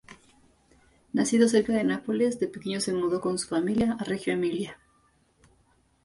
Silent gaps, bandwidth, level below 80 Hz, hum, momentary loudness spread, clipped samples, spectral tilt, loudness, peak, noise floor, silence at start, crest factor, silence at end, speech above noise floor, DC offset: none; 11.5 kHz; -60 dBFS; none; 9 LU; under 0.1%; -5 dB/octave; -27 LUFS; -10 dBFS; -65 dBFS; 0.1 s; 18 dB; 1.3 s; 40 dB; under 0.1%